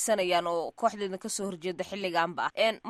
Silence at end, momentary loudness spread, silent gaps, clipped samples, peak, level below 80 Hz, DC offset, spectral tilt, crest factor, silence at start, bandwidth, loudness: 0 s; 8 LU; none; under 0.1%; -12 dBFS; -72 dBFS; under 0.1%; -3 dB/octave; 18 dB; 0 s; 15 kHz; -30 LUFS